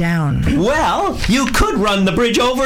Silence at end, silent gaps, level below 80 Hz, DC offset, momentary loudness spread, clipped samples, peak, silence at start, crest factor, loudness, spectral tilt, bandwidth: 0 s; none; -26 dBFS; under 0.1%; 2 LU; under 0.1%; 0 dBFS; 0 s; 14 dB; -15 LUFS; -5 dB/octave; 17 kHz